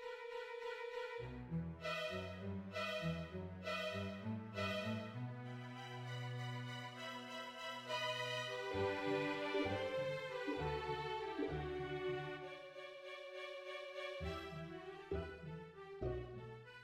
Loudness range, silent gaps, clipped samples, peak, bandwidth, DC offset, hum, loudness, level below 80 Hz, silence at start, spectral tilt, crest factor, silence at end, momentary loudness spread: 6 LU; none; under 0.1%; -26 dBFS; 16 kHz; under 0.1%; none; -45 LUFS; -64 dBFS; 0 s; -5.5 dB/octave; 18 dB; 0 s; 10 LU